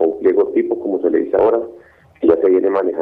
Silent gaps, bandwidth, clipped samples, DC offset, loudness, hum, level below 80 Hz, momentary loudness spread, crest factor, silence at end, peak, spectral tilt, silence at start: none; 3.8 kHz; under 0.1%; under 0.1%; -16 LUFS; none; -54 dBFS; 6 LU; 16 dB; 0 s; 0 dBFS; -9 dB/octave; 0 s